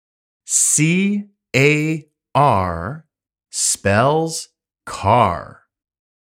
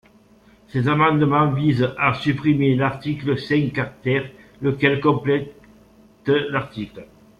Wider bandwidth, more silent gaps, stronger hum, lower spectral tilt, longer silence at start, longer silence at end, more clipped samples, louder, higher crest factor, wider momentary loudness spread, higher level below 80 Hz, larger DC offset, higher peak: first, 16.5 kHz vs 7 kHz; neither; neither; second, -4 dB/octave vs -8.5 dB/octave; second, 0.5 s vs 0.75 s; first, 0.85 s vs 0.35 s; neither; first, -17 LUFS vs -20 LUFS; about the same, 20 dB vs 20 dB; first, 14 LU vs 11 LU; about the same, -50 dBFS vs -52 dBFS; neither; about the same, 0 dBFS vs -2 dBFS